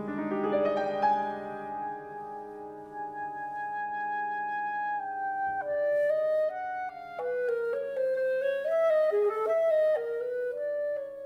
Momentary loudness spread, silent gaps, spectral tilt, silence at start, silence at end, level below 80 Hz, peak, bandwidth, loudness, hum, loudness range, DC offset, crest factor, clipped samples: 12 LU; none; -6.5 dB/octave; 0 s; 0 s; -72 dBFS; -16 dBFS; 6.4 kHz; -30 LUFS; none; 7 LU; under 0.1%; 14 dB; under 0.1%